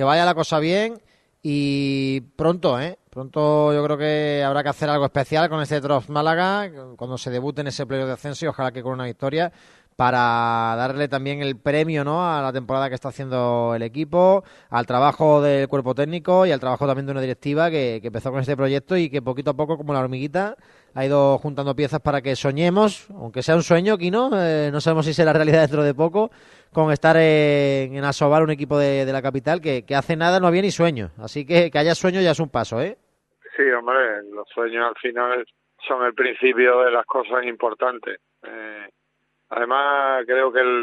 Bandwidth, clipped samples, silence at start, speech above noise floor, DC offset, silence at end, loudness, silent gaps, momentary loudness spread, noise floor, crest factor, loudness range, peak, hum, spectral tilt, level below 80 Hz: 11.5 kHz; under 0.1%; 0 s; 51 dB; under 0.1%; 0 s; -20 LUFS; none; 11 LU; -71 dBFS; 20 dB; 5 LU; -2 dBFS; none; -6 dB/octave; -56 dBFS